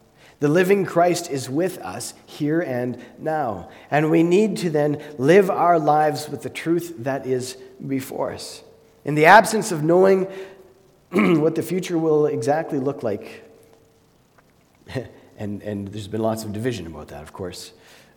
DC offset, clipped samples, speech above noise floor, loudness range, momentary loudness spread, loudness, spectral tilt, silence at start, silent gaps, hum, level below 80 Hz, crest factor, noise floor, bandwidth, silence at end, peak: under 0.1%; under 0.1%; 37 dB; 12 LU; 18 LU; -20 LUFS; -5.5 dB/octave; 0.4 s; none; none; -60 dBFS; 22 dB; -57 dBFS; 19 kHz; 0.45 s; 0 dBFS